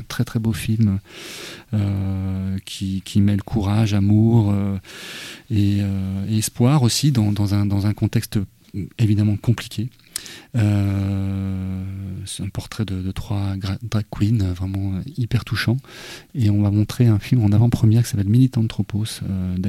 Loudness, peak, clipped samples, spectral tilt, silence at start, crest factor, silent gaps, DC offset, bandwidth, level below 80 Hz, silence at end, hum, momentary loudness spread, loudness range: -21 LUFS; -6 dBFS; under 0.1%; -6.5 dB/octave; 0 s; 14 dB; none; under 0.1%; 14.5 kHz; -44 dBFS; 0 s; none; 13 LU; 6 LU